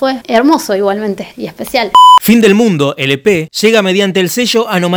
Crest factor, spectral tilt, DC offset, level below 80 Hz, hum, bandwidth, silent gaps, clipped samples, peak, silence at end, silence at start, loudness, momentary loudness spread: 10 dB; -4.5 dB/octave; under 0.1%; -50 dBFS; none; over 20 kHz; none; 1%; 0 dBFS; 0 s; 0 s; -9 LUFS; 12 LU